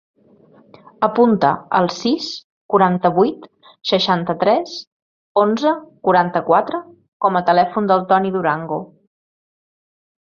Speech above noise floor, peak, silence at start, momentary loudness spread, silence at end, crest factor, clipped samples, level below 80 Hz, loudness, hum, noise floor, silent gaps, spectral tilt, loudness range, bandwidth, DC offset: 34 dB; 0 dBFS; 1 s; 12 LU; 1.4 s; 18 dB; under 0.1%; -62 dBFS; -17 LUFS; none; -50 dBFS; 2.44-2.69 s, 4.87-5.35 s, 7.08-7.20 s; -6 dB/octave; 2 LU; 7.4 kHz; under 0.1%